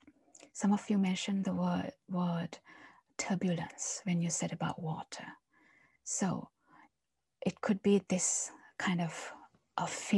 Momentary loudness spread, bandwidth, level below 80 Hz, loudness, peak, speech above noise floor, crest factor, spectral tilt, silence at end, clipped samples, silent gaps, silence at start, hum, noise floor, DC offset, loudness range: 15 LU; 12 kHz; -76 dBFS; -35 LUFS; -16 dBFS; 54 dB; 20 dB; -4.5 dB/octave; 0 s; under 0.1%; none; 0.55 s; none; -88 dBFS; under 0.1%; 4 LU